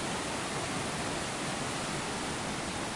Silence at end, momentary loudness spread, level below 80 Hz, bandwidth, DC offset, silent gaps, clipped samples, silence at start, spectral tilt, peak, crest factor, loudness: 0 s; 1 LU; -54 dBFS; 11.5 kHz; under 0.1%; none; under 0.1%; 0 s; -3 dB/octave; -22 dBFS; 12 dB; -34 LUFS